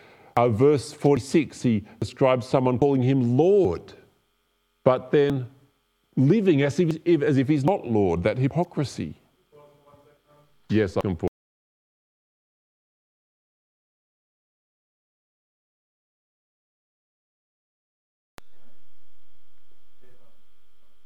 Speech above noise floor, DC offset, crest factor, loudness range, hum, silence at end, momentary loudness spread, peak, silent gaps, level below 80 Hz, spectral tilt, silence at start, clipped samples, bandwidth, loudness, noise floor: 49 dB; under 0.1%; 22 dB; 9 LU; none; 0 s; 11 LU; -4 dBFS; 11.28-18.38 s; -60 dBFS; -7.5 dB/octave; 0 s; under 0.1%; 12 kHz; -23 LUFS; -70 dBFS